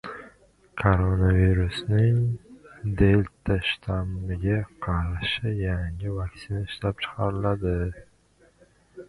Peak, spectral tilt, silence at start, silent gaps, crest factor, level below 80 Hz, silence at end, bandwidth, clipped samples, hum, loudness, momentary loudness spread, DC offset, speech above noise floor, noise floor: -4 dBFS; -8 dB/octave; 0.05 s; none; 20 dB; -36 dBFS; 0.05 s; 11 kHz; under 0.1%; none; -26 LUFS; 12 LU; under 0.1%; 36 dB; -60 dBFS